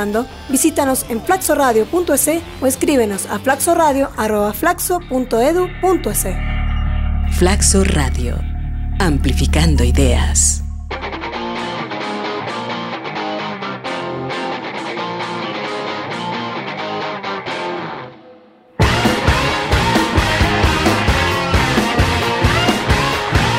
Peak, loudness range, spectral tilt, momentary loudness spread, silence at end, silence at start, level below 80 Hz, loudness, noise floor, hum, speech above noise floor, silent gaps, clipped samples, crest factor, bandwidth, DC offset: -2 dBFS; 8 LU; -4 dB/octave; 10 LU; 0 s; 0 s; -24 dBFS; -17 LUFS; -44 dBFS; none; 29 dB; none; under 0.1%; 16 dB; 16 kHz; under 0.1%